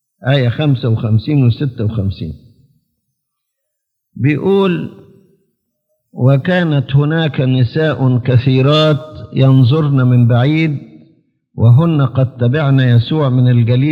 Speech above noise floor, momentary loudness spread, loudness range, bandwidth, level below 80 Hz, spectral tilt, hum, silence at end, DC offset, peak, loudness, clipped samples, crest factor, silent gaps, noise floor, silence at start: 62 dB; 8 LU; 8 LU; 5.2 kHz; -50 dBFS; -9 dB/octave; none; 0 s; under 0.1%; 0 dBFS; -13 LUFS; under 0.1%; 12 dB; none; -73 dBFS; 0.2 s